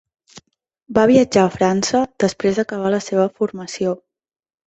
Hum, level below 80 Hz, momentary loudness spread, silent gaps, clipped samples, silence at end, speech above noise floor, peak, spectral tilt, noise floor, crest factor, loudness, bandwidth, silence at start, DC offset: none; -54 dBFS; 10 LU; none; under 0.1%; 0.7 s; 31 dB; -2 dBFS; -5 dB/octave; -48 dBFS; 18 dB; -18 LUFS; 8.4 kHz; 0.35 s; under 0.1%